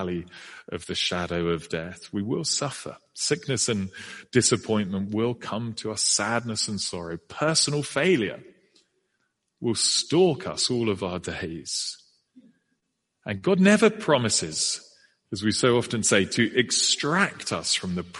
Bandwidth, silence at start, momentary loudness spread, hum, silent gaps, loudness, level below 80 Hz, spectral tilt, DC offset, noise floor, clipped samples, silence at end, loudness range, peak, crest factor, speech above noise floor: 11.5 kHz; 0 s; 13 LU; none; none; -24 LUFS; -60 dBFS; -3.5 dB/octave; under 0.1%; -78 dBFS; under 0.1%; 0 s; 5 LU; -4 dBFS; 22 dB; 52 dB